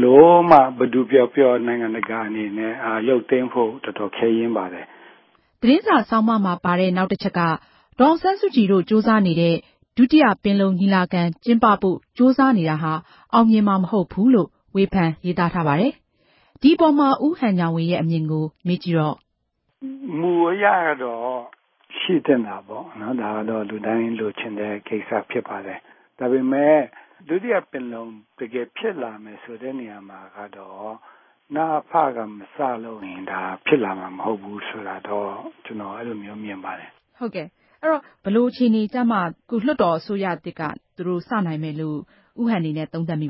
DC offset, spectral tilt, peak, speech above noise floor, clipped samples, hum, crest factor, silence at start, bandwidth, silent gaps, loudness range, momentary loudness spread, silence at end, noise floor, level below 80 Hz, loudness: under 0.1%; -10.5 dB/octave; 0 dBFS; 52 dB; under 0.1%; none; 20 dB; 0 s; 5.8 kHz; none; 9 LU; 17 LU; 0 s; -72 dBFS; -58 dBFS; -20 LUFS